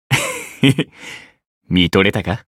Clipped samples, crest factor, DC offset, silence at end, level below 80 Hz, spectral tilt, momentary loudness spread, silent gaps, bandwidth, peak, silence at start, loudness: under 0.1%; 18 dB; under 0.1%; 0.2 s; -44 dBFS; -5 dB/octave; 20 LU; 1.46-1.61 s; 16 kHz; 0 dBFS; 0.1 s; -17 LUFS